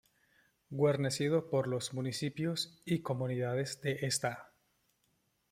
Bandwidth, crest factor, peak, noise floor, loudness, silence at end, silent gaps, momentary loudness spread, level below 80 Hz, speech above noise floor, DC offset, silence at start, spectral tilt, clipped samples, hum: 16 kHz; 18 dB; -18 dBFS; -77 dBFS; -35 LUFS; 1.05 s; none; 6 LU; -74 dBFS; 43 dB; under 0.1%; 0.7 s; -5 dB/octave; under 0.1%; none